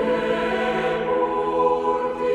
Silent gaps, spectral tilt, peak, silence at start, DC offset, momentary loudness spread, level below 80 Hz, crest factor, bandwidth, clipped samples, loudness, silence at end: none; -6 dB/octave; -8 dBFS; 0 s; under 0.1%; 3 LU; -50 dBFS; 12 dB; 10 kHz; under 0.1%; -22 LUFS; 0 s